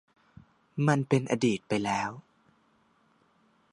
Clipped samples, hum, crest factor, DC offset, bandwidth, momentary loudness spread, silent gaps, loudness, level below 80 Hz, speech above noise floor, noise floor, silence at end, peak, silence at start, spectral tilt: under 0.1%; none; 22 dB; under 0.1%; 11 kHz; 13 LU; none; -28 LUFS; -68 dBFS; 40 dB; -67 dBFS; 1.55 s; -10 dBFS; 0.75 s; -6 dB/octave